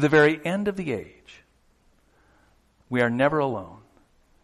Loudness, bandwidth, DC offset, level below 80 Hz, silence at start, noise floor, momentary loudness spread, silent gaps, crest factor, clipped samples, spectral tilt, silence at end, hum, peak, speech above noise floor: -24 LUFS; 12.5 kHz; under 0.1%; -58 dBFS; 0 s; -62 dBFS; 16 LU; none; 20 dB; under 0.1%; -6.5 dB/octave; 0.7 s; none; -6 dBFS; 39 dB